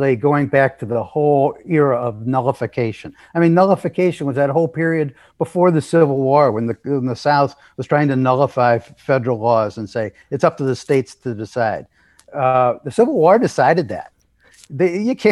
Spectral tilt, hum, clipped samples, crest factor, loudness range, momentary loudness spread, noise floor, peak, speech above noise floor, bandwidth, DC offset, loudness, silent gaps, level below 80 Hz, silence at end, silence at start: -7.5 dB/octave; none; under 0.1%; 16 dB; 3 LU; 11 LU; -52 dBFS; 0 dBFS; 36 dB; 12 kHz; under 0.1%; -17 LUFS; none; -60 dBFS; 0 s; 0 s